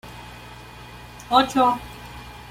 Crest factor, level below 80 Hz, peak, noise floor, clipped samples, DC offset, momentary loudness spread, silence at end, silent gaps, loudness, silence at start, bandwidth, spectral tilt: 22 dB; -48 dBFS; -2 dBFS; -41 dBFS; under 0.1%; under 0.1%; 22 LU; 0 s; none; -20 LUFS; 0.05 s; 16.5 kHz; -4.5 dB/octave